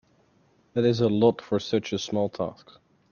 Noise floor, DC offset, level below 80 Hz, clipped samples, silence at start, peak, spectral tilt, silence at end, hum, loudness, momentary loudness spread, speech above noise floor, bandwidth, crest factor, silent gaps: -63 dBFS; under 0.1%; -64 dBFS; under 0.1%; 0.75 s; -6 dBFS; -6.5 dB/octave; 0.6 s; none; -26 LUFS; 11 LU; 38 dB; 7.2 kHz; 20 dB; none